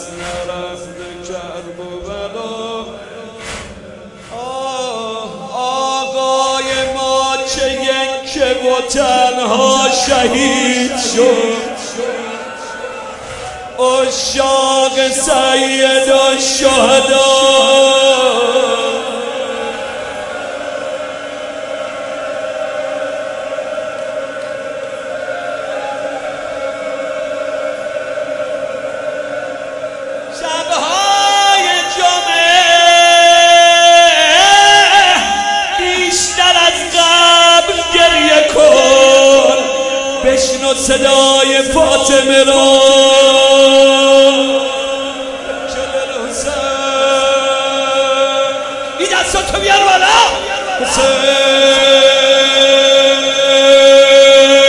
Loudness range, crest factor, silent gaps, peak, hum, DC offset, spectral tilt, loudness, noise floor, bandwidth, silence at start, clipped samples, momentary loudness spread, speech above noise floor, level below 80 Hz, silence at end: 15 LU; 12 dB; none; 0 dBFS; none; under 0.1%; -1 dB/octave; -10 LUFS; -33 dBFS; 11.5 kHz; 0 s; under 0.1%; 18 LU; 23 dB; -42 dBFS; 0 s